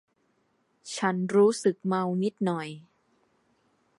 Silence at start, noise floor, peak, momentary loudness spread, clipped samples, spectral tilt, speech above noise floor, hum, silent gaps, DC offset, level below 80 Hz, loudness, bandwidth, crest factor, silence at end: 0.85 s; -71 dBFS; -10 dBFS; 17 LU; under 0.1%; -6 dB/octave; 45 dB; none; none; under 0.1%; -80 dBFS; -27 LUFS; 11.5 kHz; 18 dB; 1.2 s